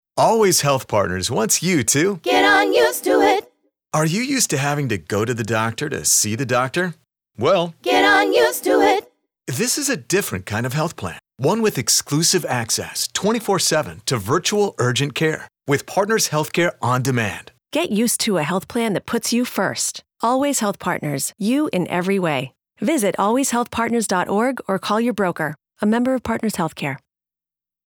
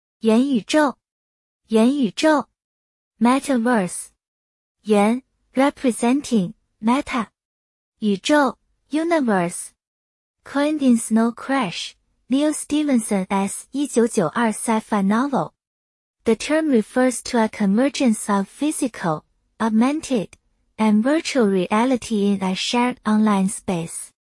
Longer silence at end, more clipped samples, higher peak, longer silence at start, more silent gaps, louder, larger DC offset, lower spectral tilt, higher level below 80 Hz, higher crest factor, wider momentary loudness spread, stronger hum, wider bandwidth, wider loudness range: first, 0.9 s vs 0.2 s; neither; about the same, -6 dBFS vs -4 dBFS; about the same, 0.15 s vs 0.25 s; second, none vs 1.12-1.60 s, 2.64-3.11 s, 4.28-4.75 s, 7.45-7.92 s, 9.87-10.34 s, 15.67-16.14 s; about the same, -19 LUFS vs -20 LUFS; neither; second, -3.5 dB/octave vs -5 dB/octave; about the same, -56 dBFS vs -60 dBFS; about the same, 14 dB vs 16 dB; about the same, 8 LU vs 8 LU; neither; first, over 20 kHz vs 12 kHz; about the same, 4 LU vs 2 LU